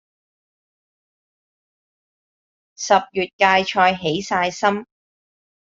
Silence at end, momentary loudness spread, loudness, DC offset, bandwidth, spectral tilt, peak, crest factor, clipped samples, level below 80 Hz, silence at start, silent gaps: 0.95 s; 9 LU; -19 LUFS; under 0.1%; 7.8 kHz; -3.5 dB/octave; -2 dBFS; 22 dB; under 0.1%; -64 dBFS; 2.8 s; 3.33-3.39 s